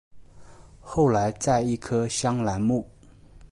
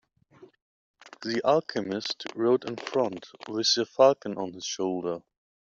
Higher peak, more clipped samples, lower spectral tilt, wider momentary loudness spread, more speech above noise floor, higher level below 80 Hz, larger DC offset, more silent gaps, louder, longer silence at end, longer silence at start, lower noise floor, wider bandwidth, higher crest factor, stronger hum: about the same, -10 dBFS vs -8 dBFS; neither; first, -5.5 dB/octave vs -3 dB/octave; second, 7 LU vs 13 LU; about the same, 27 dB vs 29 dB; first, -48 dBFS vs -74 dBFS; neither; second, none vs 0.62-0.94 s; about the same, -25 LUFS vs -27 LUFS; second, 0.05 s vs 0.4 s; second, 0.15 s vs 0.4 s; second, -50 dBFS vs -56 dBFS; first, 11.5 kHz vs 7.8 kHz; second, 16 dB vs 22 dB; neither